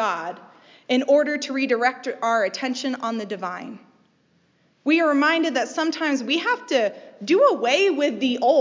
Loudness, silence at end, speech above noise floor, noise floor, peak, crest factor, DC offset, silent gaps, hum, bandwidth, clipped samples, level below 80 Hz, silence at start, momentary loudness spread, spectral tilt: -22 LUFS; 0 s; 41 dB; -63 dBFS; -6 dBFS; 16 dB; under 0.1%; none; none; 7.6 kHz; under 0.1%; -84 dBFS; 0 s; 12 LU; -3 dB/octave